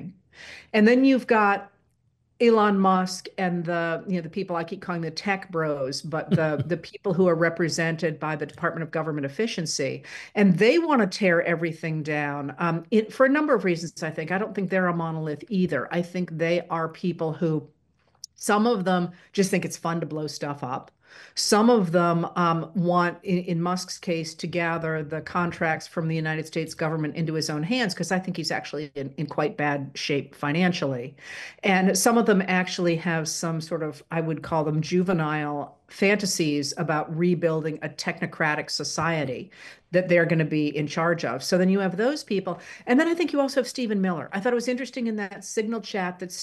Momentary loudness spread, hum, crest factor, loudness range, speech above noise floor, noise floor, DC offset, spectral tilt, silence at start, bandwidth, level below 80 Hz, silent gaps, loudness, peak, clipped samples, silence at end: 10 LU; none; 18 dB; 4 LU; 44 dB; -68 dBFS; under 0.1%; -5.5 dB/octave; 0 s; 12.5 kHz; -66 dBFS; none; -25 LUFS; -6 dBFS; under 0.1%; 0 s